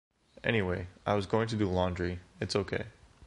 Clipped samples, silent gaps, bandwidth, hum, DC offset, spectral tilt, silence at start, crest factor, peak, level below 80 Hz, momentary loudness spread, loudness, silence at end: under 0.1%; none; 11.5 kHz; none; under 0.1%; -6 dB/octave; 0.45 s; 20 dB; -12 dBFS; -48 dBFS; 8 LU; -32 LUFS; 0 s